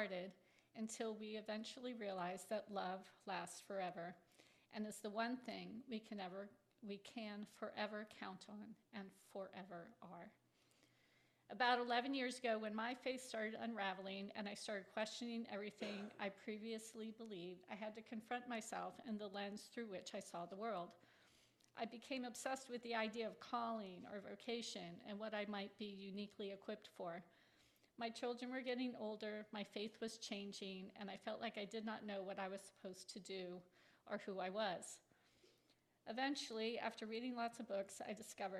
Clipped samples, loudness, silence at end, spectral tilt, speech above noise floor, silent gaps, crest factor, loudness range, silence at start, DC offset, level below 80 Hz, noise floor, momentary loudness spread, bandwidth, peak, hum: under 0.1%; -48 LUFS; 0 s; -4 dB/octave; 31 dB; none; 24 dB; 7 LU; 0 s; under 0.1%; under -90 dBFS; -79 dBFS; 11 LU; 14 kHz; -24 dBFS; none